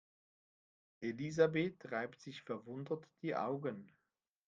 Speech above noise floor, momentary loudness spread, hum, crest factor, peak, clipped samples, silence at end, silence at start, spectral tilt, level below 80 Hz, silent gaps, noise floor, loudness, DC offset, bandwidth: 49 dB; 13 LU; none; 24 dB; -18 dBFS; under 0.1%; 0.6 s; 1 s; -6.5 dB/octave; -82 dBFS; none; -88 dBFS; -40 LUFS; under 0.1%; 7.6 kHz